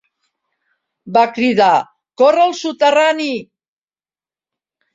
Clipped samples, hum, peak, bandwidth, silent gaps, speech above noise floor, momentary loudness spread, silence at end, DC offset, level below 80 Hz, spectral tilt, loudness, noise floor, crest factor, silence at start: under 0.1%; none; -2 dBFS; 7.8 kHz; none; over 77 dB; 9 LU; 1.5 s; under 0.1%; -64 dBFS; -4 dB/octave; -14 LUFS; under -90 dBFS; 16 dB; 1.05 s